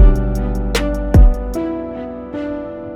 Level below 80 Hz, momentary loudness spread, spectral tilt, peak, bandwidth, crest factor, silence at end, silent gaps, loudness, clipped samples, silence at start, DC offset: -16 dBFS; 14 LU; -7 dB/octave; 0 dBFS; 12 kHz; 14 dB; 0 s; none; -18 LUFS; under 0.1%; 0 s; under 0.1%